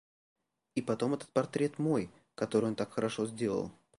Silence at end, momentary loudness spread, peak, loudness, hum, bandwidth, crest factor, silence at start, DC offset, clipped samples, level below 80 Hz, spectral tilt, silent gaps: 0.3 s; 7 LU; -14 dBFS; -34 LUFS; none; 11.5 kHz; 20 dB; 0.75 s; under 0.1%; under 0.1%; -70 dBFS; -6.5 dB/octave; none